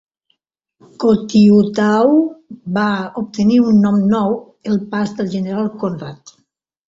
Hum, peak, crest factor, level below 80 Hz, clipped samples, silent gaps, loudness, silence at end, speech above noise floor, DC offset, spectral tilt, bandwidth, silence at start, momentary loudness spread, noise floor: none; -2 dBFS; 14 dB; -54 dBFS; under 0.1%; none; -15 LUFS; 0.7 s; 52 dB; under 0.1%; -7.5 dB/octave; 7.6 kHz; 1 s; 12 LU; -66 dBFS